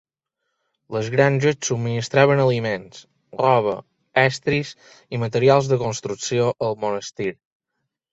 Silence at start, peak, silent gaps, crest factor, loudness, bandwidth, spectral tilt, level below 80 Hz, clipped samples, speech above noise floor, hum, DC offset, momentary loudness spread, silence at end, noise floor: 0.9 s; -2 dBFS; none; 20 dB; -21 LUFS; 8 kHz; -5.5 dB/octave; -58 dBFS; under 0.1%; 58 dB; none; under 0.1%; 12 LU; 0.8 s; -79 dBFS